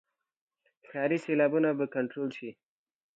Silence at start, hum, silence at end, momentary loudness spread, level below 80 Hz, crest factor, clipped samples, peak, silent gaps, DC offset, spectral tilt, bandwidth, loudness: 0.9 s; none; 0.65 s; 16 LU; -84 dBFS; 18 dB; under 0.1%; -14 dBFS; none; under 0.1%; -7.5 dB/octave; 8 kHz; -30 LUFS